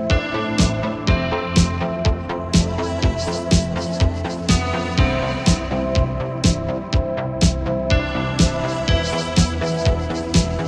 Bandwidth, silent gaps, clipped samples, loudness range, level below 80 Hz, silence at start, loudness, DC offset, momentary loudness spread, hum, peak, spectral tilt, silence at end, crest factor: 11.5 kHz; none; under 0.1%; 1 LU; -26 dBFS; 0 s; -20 LUFS; under 0.1%; 4 LU; none; -2 dBFS; -5.5 dB/octave; 0 s; 16 dB